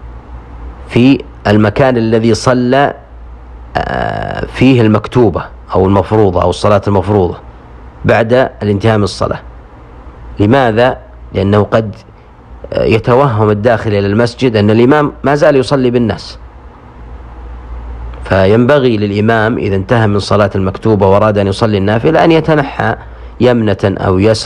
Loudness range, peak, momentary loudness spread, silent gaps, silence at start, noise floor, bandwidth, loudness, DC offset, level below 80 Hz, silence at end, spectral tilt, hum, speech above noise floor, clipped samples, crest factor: 4 LU; 0 dBFS; 16 LU; none; 0 s; -34 dBFS; 10.5 kHz; -11 LUFS; under 0.1%; -32 dBFS; 0 s; -7 dB/octave; none; 25 dB; 0.6%; 10 dB